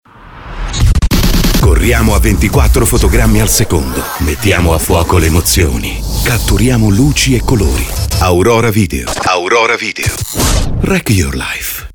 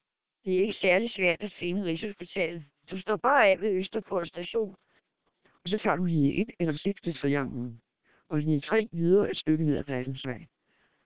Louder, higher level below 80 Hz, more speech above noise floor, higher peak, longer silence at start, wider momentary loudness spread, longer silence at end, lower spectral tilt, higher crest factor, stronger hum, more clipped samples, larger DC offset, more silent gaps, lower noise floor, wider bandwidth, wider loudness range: first, -11 LUFS vs -28 LUFS; first, -16 dBFS vs -62 dBFS; second, 21 dB vs 45 dB; first, 0 dBFS vs -8 dBFS; first, 0.25 s vs 0 s; second, 6 LU vs 13 LU; about the same, 0.05 s vs 0 s; second, -4.5 dB/octave vs -10 dB/octave; second, 10 dB vs 20 dB; neither; neither; second, under 0.1% vs 0.3%; neither; second, -31 dBFS vs -73 dBFS; first, over 20 kHz vs 4 kHz; about the same, 2 LU vs 3 LU